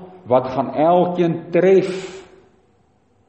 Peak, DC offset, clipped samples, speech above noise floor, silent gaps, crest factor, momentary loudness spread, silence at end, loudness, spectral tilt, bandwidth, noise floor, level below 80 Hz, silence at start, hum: -2 dBFS; under 0.1%; under 0.1%; 42 dB; none; 16 dB; 11 LU; 1.05 s; -17 LUFS; -7.5 dB/octave; 8.4 kHz; -59 dBFS; -60 dBFS; 0 s; none